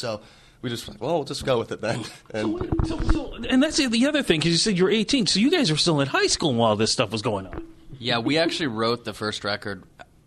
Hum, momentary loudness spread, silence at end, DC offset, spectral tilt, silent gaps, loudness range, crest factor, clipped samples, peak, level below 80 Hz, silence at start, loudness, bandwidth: none; 12 LU; 0.25 s; under 0.1%; -4 dB/octave; none; 6 LU; 18 dB; under 0.1%; -6 dBFS; -36 dBFS; 0 s; -23 LUFS; 13 kHz